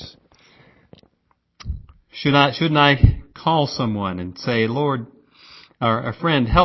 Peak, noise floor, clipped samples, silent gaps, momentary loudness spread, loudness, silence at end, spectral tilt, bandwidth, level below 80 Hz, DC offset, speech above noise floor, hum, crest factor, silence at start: 0 dBFS; -67 dBFS; under 0.1%; none; 20 LU; -19 LUFS; 0 s; -7 dB/octave; 6 kHz; -32 dBFS; under 0.1%; 49 dB; none; 20 dB; 0 s